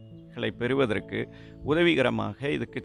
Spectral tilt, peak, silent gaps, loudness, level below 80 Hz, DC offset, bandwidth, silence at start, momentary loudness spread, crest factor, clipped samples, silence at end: -6.5 dB/octave; -10 dBFS; none; -27 LUFS; -54 dBFS; under 0.1%; 10.5 kHz; 0 s; 14 LU; 18 dB; under 0.1%; 0 s